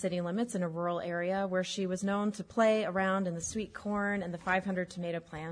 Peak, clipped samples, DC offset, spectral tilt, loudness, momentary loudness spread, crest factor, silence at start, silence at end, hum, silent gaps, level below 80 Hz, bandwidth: -16 dBFS; under 0.1%; under 0.1%; -5 dB/octave; -33 LUFS; 8 LU; 16 dB; 0 s; 0 s; none; none; -64 dBFS; 10.5 kHz